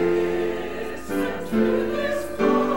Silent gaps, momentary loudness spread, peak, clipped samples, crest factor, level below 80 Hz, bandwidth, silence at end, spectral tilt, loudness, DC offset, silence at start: none; 8 LU; -8 dBFS; under 0.1%; 16 dB; -48 dBFS; 16.5 kHz; 0 s; -6 dB/octave; -24 LUFS; 1%; 0 s